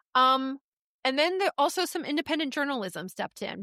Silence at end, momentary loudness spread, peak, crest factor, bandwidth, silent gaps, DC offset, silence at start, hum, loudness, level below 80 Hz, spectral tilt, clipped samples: 0 s; 13 LU; -12 dBFS; 16 dB; 16 kHz; 0.61-1.03 s; under 0.1%; 0.15 s; none; -28 LUFS; -76 dBFS; -3 dB/octave; under 0.1%